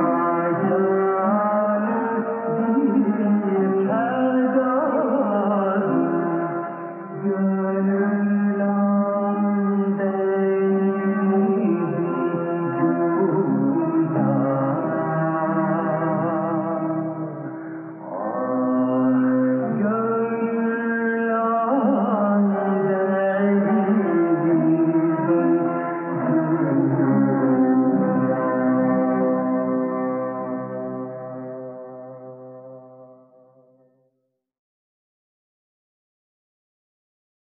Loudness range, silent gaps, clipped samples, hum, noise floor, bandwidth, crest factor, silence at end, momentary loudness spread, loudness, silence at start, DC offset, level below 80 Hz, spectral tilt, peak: 5 LU; none; under 0.1%; none; -75 dBFS; 3.2 kHz; 14 dB; 4.3 s; 10 LU; -21 LUFS; 0 s; under 0.1%; -82 dBFS; -9 dB/octave; -8 dBFS